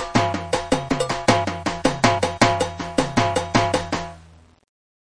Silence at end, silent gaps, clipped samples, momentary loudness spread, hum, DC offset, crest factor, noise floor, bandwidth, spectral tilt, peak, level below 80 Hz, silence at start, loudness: 0.9 s; none; under 0.1%; 6 LU; none; under 0.1%; 20 dB; -48 dBFS; 10.5 kHz; -4.5 dB/octave; -2 dBFS; -42 dBFS; 0 s; -21 LUFS